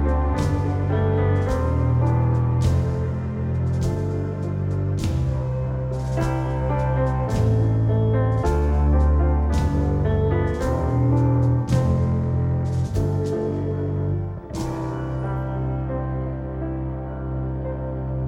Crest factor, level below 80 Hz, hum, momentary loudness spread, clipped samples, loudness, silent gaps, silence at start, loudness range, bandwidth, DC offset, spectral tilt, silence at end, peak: 14 dB; -28 dBFS; none; 8 LU; under 0.1%; -23 LUFS; none; 0 s; 6 LU; 10.5 kHz; under 0.1%; -8.5 dB/octave; 0 s; -8 dBFS